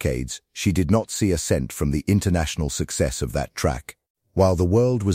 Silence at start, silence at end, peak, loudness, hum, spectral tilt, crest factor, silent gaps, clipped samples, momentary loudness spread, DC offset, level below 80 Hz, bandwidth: 0 s; 0 s; -4 dBFS; -23 LUFS; none; -5.5 dB/octave; 16 dB; 4.10-4.15 s; under 0.1%; 9 LU; under 0.1%; -36 dBFS; 16.5 kHz